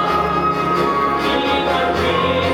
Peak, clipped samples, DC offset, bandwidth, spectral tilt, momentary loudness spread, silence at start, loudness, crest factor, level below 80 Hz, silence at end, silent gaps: -4 dBFS; under 0.1%; under 0.1%; 18 kHz; -5.5 dB/octave; 1 LU; 0 s; -17 LUFS; 12 dB; -38 dBFS; 0 s; none